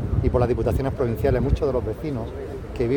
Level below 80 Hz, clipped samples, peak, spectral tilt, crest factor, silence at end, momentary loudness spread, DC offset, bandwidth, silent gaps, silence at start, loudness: -30 dBFS; under 0.1%; -8 dBFS; -9 dB/octave; 16 dB; 0 s; 10 LU; under 0.1%; 18 kHz; none; 0 s; -24 LUFS